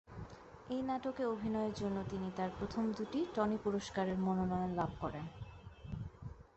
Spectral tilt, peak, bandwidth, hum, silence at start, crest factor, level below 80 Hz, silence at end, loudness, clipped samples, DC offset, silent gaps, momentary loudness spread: -7 dB/octave; -22 dBFS; 8.2 kHz; none; 0.1 s; 18 dB; -58 dBFS; 0.15 s; -39 LUFS; under 0.1%; under 0.1%; none; 16 LU